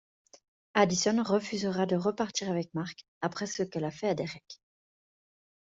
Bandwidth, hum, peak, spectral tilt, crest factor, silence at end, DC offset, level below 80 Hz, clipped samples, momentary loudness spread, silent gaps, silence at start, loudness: 8 kHz; none; -10 dBFS; -4.5 dB/octave; 22 dB; 1.25 s; under 0.1%; -70 dBFS; under 0.1%; 12 LU; 3.08-3.21 s; 0.75 s; -31 LUFS